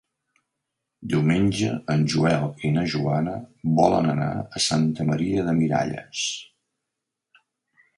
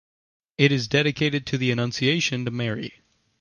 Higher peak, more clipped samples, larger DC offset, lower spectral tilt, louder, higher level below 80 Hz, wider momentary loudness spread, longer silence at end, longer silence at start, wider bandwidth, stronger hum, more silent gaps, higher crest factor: about the same, -4 dBFS vs -6 dBFS; neither; neither; about the same, -5.5 dB/octave vs -5 dB/octave; about the same, -23 LUFS vs -23 LUFS; first, -52 dBFS vs -58 dBFS; about the same, 8 LU vs 10 LU; first, 1.55 s vs 0.5 s; first, 1 s vs 0.6 s; first, 11.5 kHz vs 10 kHz; neither; neither; about the same, 20 dB vs 20 dB